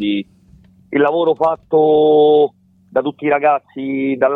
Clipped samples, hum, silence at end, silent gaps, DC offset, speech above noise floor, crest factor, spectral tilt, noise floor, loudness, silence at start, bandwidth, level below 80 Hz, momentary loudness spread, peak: under 0.1%; none; 0 s; none; under 0.1%; 33 dB; 12 dB; -8.5 dB/octave; -47 dBFS; -15 LUFS; 0 s; 4 kHz; -58 dBFS; 10 LU; -4 dBFS